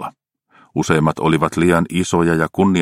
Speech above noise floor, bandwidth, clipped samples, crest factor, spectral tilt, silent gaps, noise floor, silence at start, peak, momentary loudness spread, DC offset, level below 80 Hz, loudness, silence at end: 39 dB; 15 kHz; under 0.1%; 16 dB; -6 dB/octave; none; -55 dBFS; 0 s; 0 dBFS; 8 LU; under 0.1%; -44 dBFS; -17 LUFS; 0 s